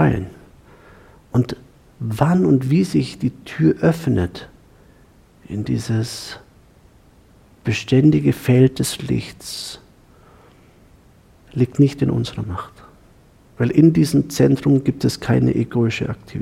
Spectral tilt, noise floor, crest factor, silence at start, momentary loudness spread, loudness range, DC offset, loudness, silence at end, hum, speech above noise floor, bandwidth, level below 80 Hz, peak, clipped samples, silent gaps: -7 dB/octave; -50 dBFS; 18 dB; 0 s; 16 LU; 7 LU; under 0.1%; -19 LUFS; 0 s; none; 33 dB; 16 kHz; -46 dBFS; -2 dBFS; under 0.1%; none